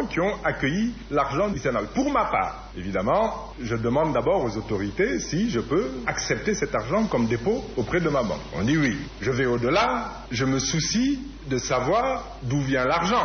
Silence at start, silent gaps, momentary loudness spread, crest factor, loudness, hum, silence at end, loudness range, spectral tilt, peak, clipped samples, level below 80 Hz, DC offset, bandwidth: 0 s; none; 6 LU; 14 dB; -25 LUFS; none; 0 s; 1 LU; -4.5 dB/octave; -10 dBFS; under 0.1%; -42 dBFS; under 0.1%; 6.6 kHz